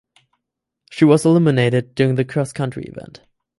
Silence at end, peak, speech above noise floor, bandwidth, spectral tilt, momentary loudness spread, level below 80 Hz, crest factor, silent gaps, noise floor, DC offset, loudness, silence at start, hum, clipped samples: 0.55 s; -2 dBFS; 64 dB; 11.5 kHz; -7 dB/octave; 20 LU; -56 dBFS; 18 dB; none; -80 dBFS; under 0.1%; -17 LUFS; 0.9 s; none; under 0.1%